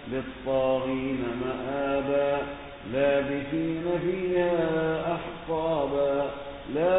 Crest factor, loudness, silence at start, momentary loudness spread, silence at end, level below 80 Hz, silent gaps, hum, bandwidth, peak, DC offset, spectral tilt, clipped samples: 16 dB; -28 LUFS; 0 s; 8 LU; 0 s; -50 dBFS; none; none; 4 kHz; -12 dBFS; under 0.1%; -10.5 dB/octave; under 0.1%